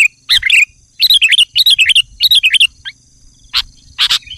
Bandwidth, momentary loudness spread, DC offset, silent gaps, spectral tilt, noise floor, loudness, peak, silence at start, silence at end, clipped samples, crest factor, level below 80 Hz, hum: 15.5 kHz; 11 LU; under 0.1%; none; 3.5 dB/octave; -45 dBFS; -8 LUFS; -2 dBFS; 0 s; 0 s; under 0.1%; 10 dB; -44 dBFS; none